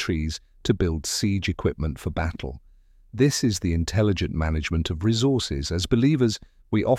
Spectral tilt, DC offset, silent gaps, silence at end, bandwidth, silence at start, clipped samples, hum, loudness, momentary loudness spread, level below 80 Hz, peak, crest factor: -5.5 dB/octave; under 0.1%; none; 0 s; 15.5 kHz; 0 s; under 0.1%; none; -24 LUFS; 9 LU; -36 dBFS; -6 dBFS; 18 dB